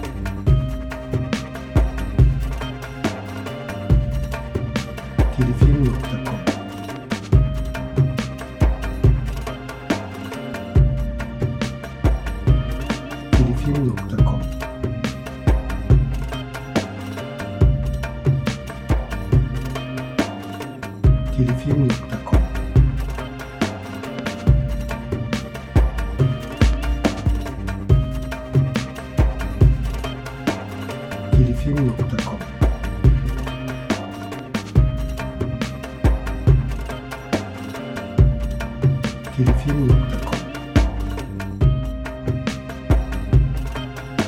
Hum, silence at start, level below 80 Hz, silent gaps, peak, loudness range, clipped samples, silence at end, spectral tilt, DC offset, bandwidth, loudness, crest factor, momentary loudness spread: none; 0 s; -24 dBFS; none; -2 dBFS; 2 LU; under 0.1%; 0 s; -7 dB/octave; under 0.1%; 14 kHz; -22 LUFS; 18 dB; 11 LU